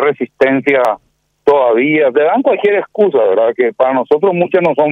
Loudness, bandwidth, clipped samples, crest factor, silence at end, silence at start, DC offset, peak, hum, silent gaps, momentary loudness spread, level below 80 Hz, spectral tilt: -12 LUFS; 6.6 kHz; under 0.1%; 12 dB; 0 s; 0 s; under 0.1%; 0 dBFS; none; none; 3 LU; -58 dBFS; -7.5 dB/octave